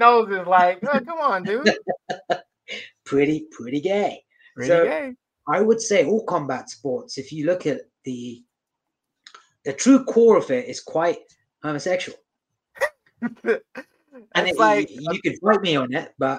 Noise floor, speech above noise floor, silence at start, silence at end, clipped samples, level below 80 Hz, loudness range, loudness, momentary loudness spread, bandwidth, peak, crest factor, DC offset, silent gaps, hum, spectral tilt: -82 dBFS; 61 dB; 0 s; 0 s; under 0.1%; -68 dBFS; 6 LU; -21 LUFS; 17 LU; 11.5 kHz; 0 dBFS; 22 dB; under 0.1%; none; none; -4.5 dB/octave